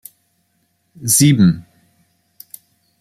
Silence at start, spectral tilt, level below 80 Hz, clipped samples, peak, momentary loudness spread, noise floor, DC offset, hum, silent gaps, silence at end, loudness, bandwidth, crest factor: 1 s; -4.5 dB/octave; -54 dBFS; under 0.1%; 0 dBFS; 27 LU; -65 dBFS; under 0.1%; none; none; 1.4 s; -14 LUFS; 15.5 kHz; 18 dB